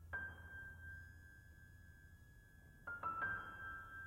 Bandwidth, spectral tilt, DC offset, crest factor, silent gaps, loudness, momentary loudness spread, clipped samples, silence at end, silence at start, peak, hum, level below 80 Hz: 16 kHz; -5.5 dB/octave; under 0.1%; 18 dB; none; -48 LUFS; 21 LU; under 0.1%; 0 s; 0 s; -34 dBFS; none; -64 dBFS